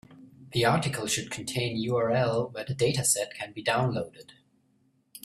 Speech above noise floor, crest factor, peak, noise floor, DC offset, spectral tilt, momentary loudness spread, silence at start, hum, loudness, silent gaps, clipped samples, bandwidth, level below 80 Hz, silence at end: 40 dB; 20 dB; -10 dBFS; -68 dBFS; under 0.1%; -4 dB/octave; 8 LU; 0.1 s; none; -28 LUFS; none; under 0.1%; 15 kHz; -62 dBFS; 0.05 s